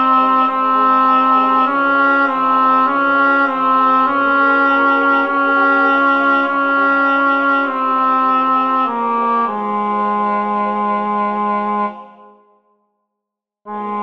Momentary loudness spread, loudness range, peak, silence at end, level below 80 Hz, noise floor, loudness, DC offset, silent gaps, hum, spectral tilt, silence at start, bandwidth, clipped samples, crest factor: 6 LU; 6 LU; -2 dBFS; 0 s; -72 dBFS; -81 dBFS; -14 LUFS; 0.4%; none; none; -6.5 dB/octave; 0 s; 6.2 kHz; under 0.1%; 12 dB